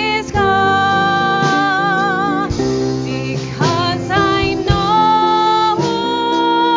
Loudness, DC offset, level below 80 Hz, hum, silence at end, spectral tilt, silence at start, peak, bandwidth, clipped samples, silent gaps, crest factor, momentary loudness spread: -15 LUFS; under 0.1%; -34 dBFS; none; 0 s; -5 dB/octave; 0 s; 0 dBFS; 7.6 kHz; under 0.1%; none; 14 dB; 5 LU